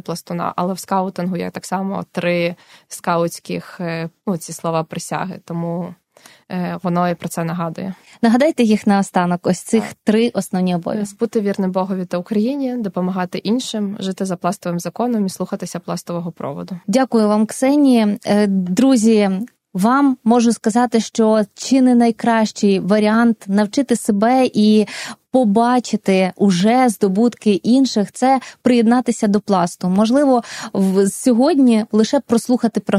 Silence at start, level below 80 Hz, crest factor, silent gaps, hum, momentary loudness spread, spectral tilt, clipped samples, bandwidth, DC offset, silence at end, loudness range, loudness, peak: 0.1 s; -62 dBFS; 16 dB; none; none; 11 LU; -6 dB/octave; under 0.1%; 15 kHz; under 0.1%; 0 s; 8 LU; -17 LUFS; 0 dBFS